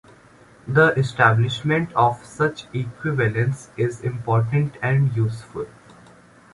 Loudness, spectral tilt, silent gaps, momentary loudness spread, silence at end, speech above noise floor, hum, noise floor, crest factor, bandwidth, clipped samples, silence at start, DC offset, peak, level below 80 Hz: -21 LUFS; -7 dB/octave; none; 12 LU; 0.85 s; 29 dB; none; -50 dBFS; 20 dB; 11.5 kHz; under 0.1%; 0.65 s; under 0.1%; -2 dBFS; -52 dBFS